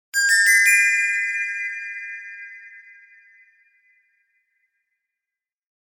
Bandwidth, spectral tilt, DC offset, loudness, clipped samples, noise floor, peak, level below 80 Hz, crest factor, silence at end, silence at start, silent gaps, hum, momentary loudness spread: 19 kHz; 10 dB/octave; under 0.1%; -17 LUFS; under 0.1%; -88 dBFS; -4 dBFS; under -90 dBFS; 20 dB; 3.1 s; 0.15 s; none; none; 24 LU